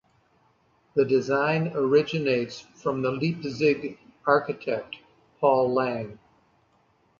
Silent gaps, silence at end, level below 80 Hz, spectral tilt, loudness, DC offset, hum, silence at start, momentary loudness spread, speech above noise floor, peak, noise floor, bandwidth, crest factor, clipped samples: none; 1.05 s; -66 dBFS; -7 dB/octave; -25 LUFS; under 0.1%; none; 0.95 s; 12 LU; 40 dB; -6 dBFS; -65 dBFS; 7.2 kHz; 22 dB; under 0.1%